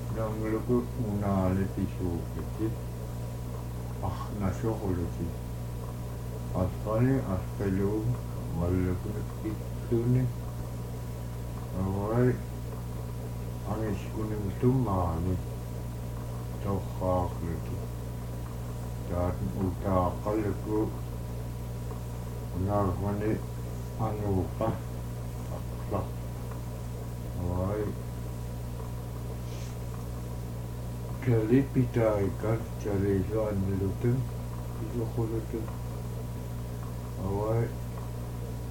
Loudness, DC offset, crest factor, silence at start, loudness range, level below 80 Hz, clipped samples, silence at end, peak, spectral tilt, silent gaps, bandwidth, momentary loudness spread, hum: -32 LUFS; under 0.1%; 18 dB; 0 s; 5 LU; -42 dBFS; under 0.1%; 0 s; -12 dBFS; -8 dB/octave; none; 17.5 kHz; 10 LU; 60 Hz at -40 dBFS